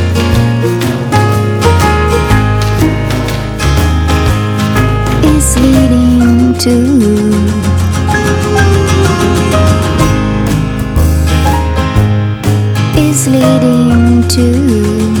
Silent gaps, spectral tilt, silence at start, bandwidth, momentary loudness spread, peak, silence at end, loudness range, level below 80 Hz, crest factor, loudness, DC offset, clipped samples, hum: none; -6 dB/octave; 0 s; 20 kHz; 4 LU; 0 dBFS; 0 s; 2 LU; -18 dBFS; 8 dB; -10 LUFS; under 0.1%; 0.9%; none